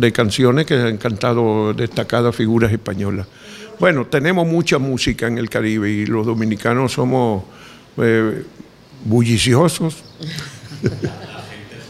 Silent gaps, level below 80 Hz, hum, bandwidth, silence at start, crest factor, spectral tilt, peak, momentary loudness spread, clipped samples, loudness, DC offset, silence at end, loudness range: none; -44 dBFS; none; 14.5 kHz; 0 s; 18 dB; -6 dB/octave; 0 dBFS; 16 LU; under 0.1%; -17 LUFS; under 0.1%; 0 s; 2 LU